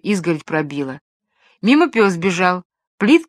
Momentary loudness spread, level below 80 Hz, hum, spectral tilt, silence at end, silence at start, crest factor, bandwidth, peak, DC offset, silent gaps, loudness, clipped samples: 12 LU; -66 dBFS; none; -5.5 dB/octave; 0.05 s; 0.05 s; 18 dB; 13 kHz; 0 dBFS; under 0.1%; 1.01-1.20 s, 2.65-2.70 s, 2.87-2.98 s; -17 LUFS; under 0.1%